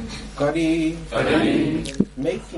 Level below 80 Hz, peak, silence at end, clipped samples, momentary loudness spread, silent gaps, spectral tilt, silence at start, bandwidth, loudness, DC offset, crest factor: -40 dBFS; -2 dBFS; 0 s; under 0.1%; 7 LU; none; -6 dB/octave; 0 s; 11.5 kHz; -22 LUFS; under 0.1%; 20 dB